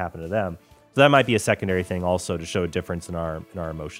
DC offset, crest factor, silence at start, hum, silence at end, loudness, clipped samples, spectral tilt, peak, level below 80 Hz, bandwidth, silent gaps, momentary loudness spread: under 0.1%; 22 dB; 0 s; none; 0 s; -23 LUFS; under 0.1%; -5 dB/octave; -2 dBFS; -48 dBFS; 16 kHz; none; 15 LU